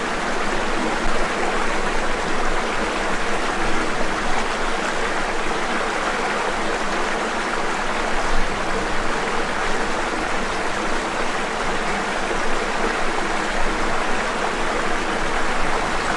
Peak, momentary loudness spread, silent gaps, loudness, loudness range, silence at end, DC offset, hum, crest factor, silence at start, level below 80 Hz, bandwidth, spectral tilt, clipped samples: -6 dBFS; 1 LU; none; -22 LUFS; 1 LU; 0 s; under 0.1%; none; 14 dB; 0 s; -28 dBFS; 11.5 kHz; -3 dB/octave; under 0.1%